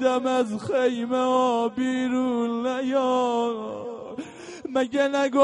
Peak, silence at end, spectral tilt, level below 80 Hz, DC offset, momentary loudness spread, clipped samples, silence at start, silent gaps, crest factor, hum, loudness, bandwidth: -6 dBFS; 0 s; -4.5 dB/octave; -68 dBFS; under 0.1%; 13 LU; under 0.1%; 0 s; none; 18 dB; none; -24 LUFS; 10.5 kHz